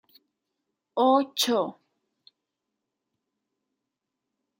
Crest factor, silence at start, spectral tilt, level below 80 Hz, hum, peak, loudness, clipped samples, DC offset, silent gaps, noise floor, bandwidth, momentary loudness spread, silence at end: 22 dB; 0.95 s; -3 dB/octave; -84 dBFS; none; -8 dBFS; -25 LUFS; under 0.1%; under 0.1%; none; -85 dBFS; 16 kHz; 12 LU; 2.85 s